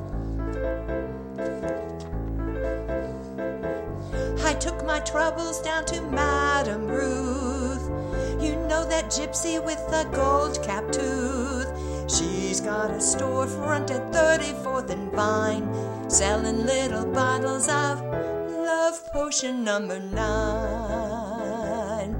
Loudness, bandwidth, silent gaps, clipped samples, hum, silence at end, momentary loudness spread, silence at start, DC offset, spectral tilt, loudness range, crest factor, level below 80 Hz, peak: -26 LUFS; 16 kHz; none; under 0.1%; none; 0 s; 8 LU; 0 s; under 0.1%; -4 dB/octave; 5 LU; 20 dB; -36 dBFS; -6 dBFS